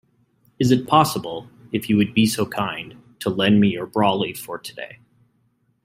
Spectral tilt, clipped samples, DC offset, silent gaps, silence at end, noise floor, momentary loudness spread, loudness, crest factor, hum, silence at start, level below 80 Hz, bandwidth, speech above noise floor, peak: -5.5 dB/octave; under 0.1%; under 0.1%; none; 0.9 s; -65 dBFS; 17 LU; -20 LUFS; 20 dB; none; 0.6 s; -58 dBFS; 16 kHz; 45 dB; -2 dBFS